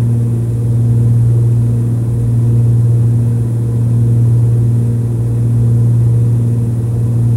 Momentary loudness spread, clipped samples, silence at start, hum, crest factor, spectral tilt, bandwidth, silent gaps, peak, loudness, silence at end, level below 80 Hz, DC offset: 4 LU; under 0.1%; 0 s; none; 8 dB; -10 dB/octave; 9.8 kHz; none; -4 dBFS; -12 LUFS; 0 s; -30 dBFS; under 0.1%